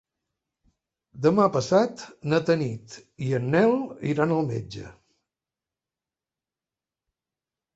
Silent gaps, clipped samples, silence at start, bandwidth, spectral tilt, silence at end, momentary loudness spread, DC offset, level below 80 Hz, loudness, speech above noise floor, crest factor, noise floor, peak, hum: none; under 0.1%; 1.15 s; 8.2 kHz; -7 dB/octave; 2.85 s; 13 LU; under 0.1%; -62 dBFS; -24 LUFS; over 66 dB; 20 dB; under -90 dBFS; -6 dBFS; none